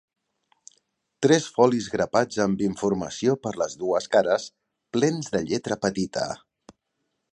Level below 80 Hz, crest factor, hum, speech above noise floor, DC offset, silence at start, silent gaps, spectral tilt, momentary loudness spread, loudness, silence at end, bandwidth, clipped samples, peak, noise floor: -60 dBFS; 22 dB; none; 54 dB; under 0.1%; 1.2 s; none; -5 dB/octave; 8 LU; -24 LUFS; 0.95 s; 11 kHz; under 0.1%; -4 dBFS; -78 dBFS